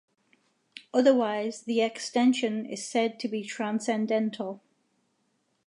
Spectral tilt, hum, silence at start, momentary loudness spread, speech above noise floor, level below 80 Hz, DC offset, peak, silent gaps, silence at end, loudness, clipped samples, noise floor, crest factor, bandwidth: -4.5 dB/octave; none; 0.75 s; 11 LU; 47 dB; -84 dBFS; under 0.1%; -10 dBFS; none; 1.1 s; -28 LUFS; under 0.1%; -74 dBFS; 20 dB; 11 kHz